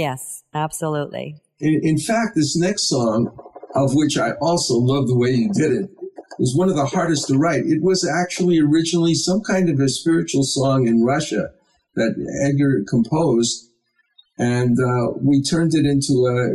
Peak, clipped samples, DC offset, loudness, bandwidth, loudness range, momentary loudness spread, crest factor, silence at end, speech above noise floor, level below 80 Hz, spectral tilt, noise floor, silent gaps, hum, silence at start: -8 dBFS; under 0.1%; under 0.1%; -19 LUFS; 14 kHz; 3 LU; 8 LU; 10 dB; 0 s; 47 dB; -52 dBFS; -5.5 dB/octave; -65 dBFS; none; none; 0 s